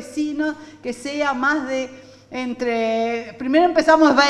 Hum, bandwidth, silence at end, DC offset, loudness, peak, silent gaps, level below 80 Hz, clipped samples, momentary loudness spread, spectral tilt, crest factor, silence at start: none; 11.5 kHz; 0 s; under 0.1%; -20 LUFS; 0 dBFS; none; -56 dBFS; under 0.1%; 15 LU; -3.5 dB/octave; 18 dB; 0 s